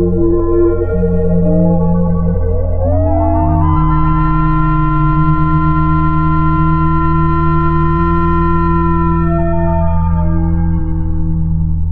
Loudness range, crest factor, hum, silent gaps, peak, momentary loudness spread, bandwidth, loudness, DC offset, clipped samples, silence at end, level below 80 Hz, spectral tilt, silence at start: 1 LU; 10 dB; none; none; 0 dBFS; 4 LU; 4.3 kHz; -13 LUFS; under 0.1%; under 0.1%; 0 s; -18 dBFS; -12.5 dB/octave; 0 s